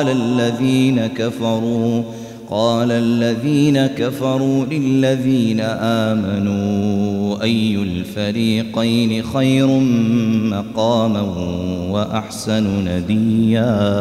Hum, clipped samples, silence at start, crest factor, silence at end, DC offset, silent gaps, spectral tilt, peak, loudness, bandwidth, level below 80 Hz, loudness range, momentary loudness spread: none; under 0.1%; 0 s; 12 dB; 0 s; under 0.1%; none; -6.5 dB/octave; -4 dBFS; -17 LUFS; 14 kHz; -48 dBFS; 2 LU; 6 LU